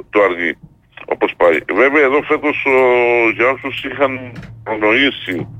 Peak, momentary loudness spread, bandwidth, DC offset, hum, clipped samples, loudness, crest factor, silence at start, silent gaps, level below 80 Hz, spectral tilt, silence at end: -2 dBFS; 13 LU; 8.8 kHz; under 0.1%; none; under 0.1%; -14 LUFS; 12 dB; 0.15 s; none; -50 dBFS; -6 dB/octave; 0 s